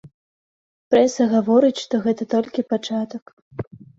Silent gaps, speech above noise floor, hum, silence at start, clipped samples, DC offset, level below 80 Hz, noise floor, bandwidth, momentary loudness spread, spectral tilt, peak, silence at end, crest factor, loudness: 0.14-0.91 s, 3.22-3.26 s, 3.33-3.51 s, 3.67-3.71 s; over 71 dB; none; 0.05 s; under 0.1%; under 0.1%; -60 dBFS; under -90 dBFS; 7.8 kHz; 18 LU; -5.5 dB/octave; -4 dBFS; 0.2 s; 18 dB; -20 LUFS